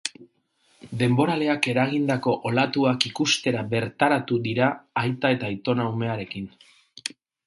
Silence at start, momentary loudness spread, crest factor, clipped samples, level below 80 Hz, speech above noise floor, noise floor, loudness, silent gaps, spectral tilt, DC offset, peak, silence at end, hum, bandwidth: 0.05 s; 13 LU; 24 dB; under 0.1%; -62 dBFS; 42 dB; -65 dBFS; -24 LUFS; none; -5 dB/octave; under 0.1%; -2 dBFS; 0.4 s; none; 11.5 kHz